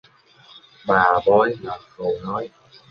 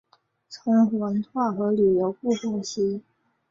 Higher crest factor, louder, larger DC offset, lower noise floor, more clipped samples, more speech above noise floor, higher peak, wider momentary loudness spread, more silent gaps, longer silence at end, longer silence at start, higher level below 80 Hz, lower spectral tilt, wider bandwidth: about the same, 20 dB vs 16 dB; first, -20 LUFS vs -24 LUFS; neither; about the same, -51 dBFS vs -52 dBFS; neither; about the same, 31 dB vs 29 dB; first, -2 dBFS vs -10 dBFS; first, 17 LU vs 10 LU; neither; about the same, 0.45 s vs 0.5 s; first, 0.85 s vs 0.5 s; first, -56 dBFS vs -66 dBFS; about the same, -7.5 dB/octave vs -6.5 dB/octave; second, 6.6 kHz vs 7.6 kHz